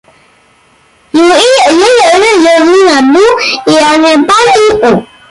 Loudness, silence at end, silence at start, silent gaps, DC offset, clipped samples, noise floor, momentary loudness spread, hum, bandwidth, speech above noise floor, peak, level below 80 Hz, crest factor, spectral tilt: -5 LUFS; 0.25 s; 1.15 s; none; under 0.1%; under 0.1%; -45 dBFS; 4 LU; none; 11.5 kHz; 39 dB; 0 dBFS; -42 dBFS; 6 dB; -3 dB/octave